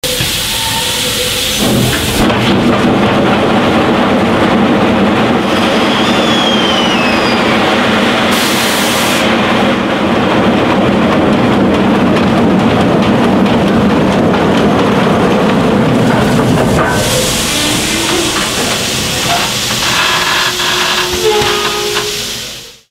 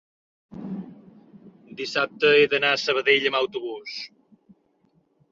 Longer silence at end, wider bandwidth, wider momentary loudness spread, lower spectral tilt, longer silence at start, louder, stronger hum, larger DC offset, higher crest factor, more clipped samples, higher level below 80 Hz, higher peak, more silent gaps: second, 0.2 s vs 1.25 s; first, 16.5 kHz vs 7.6 kHz; second, 2 LU vs 22 LU; about the same, -4 dB/octave vs -3.5 dB/octave; second, 0.05 s vs 0.5 s; first, -10 LUFS vs -21 LUFS; neither; neither; second, 10 dB vs 20 dB; neither; first, -32 dBFS vs -70 dBFS; first, 0 dBFS vs -6 dBFS; neither